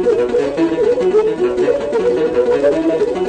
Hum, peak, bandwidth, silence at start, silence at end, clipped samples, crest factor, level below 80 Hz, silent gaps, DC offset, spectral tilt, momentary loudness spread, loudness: none; -4 dBFS; 9.4 kHz; 0 s; 0 s; under 0.1%; 10 dB; -44 dBFS; none; under 0.1%; -6.5 dB/octave; 2 LU; -15 LUFS